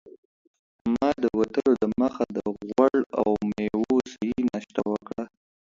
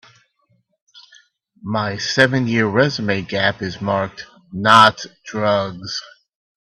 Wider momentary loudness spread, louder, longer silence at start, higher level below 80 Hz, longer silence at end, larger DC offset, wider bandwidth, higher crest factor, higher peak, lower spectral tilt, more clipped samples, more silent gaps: second, 9 LU vs 17 LU; second, -26 LUFS vs -17 LUFS; second, 0.05 s vs 0.95 s; about the same, -56 dBFS vs -58 dBFS; second, 0.35 s vs 0.55 s; neither; second, 7.6 kHz vs 13 kHz; about the same, 20 dB vs 20 dB; second, -6 dBFS vs 0 dBFS; first, -7 dB/octave vs -4.5 dB/octave; neither; first, 0.18-0.85 s, 3.06-3.10 s vs none